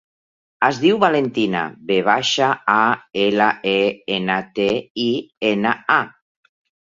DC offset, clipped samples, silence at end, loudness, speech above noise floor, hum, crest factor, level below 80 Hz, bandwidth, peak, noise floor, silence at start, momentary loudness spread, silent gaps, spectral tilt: under 0.1%; under 0.1%; 0.75 s; -18 LUFS; over 72 dB; none; 18 dB; -62 dBFS; 7.6 kHz; 0 dBFS; under -90 dBFS; 0.6 s; 6 LU; 4.90-4.95 s, 5.37-5.41 s; -4.5 dB/octave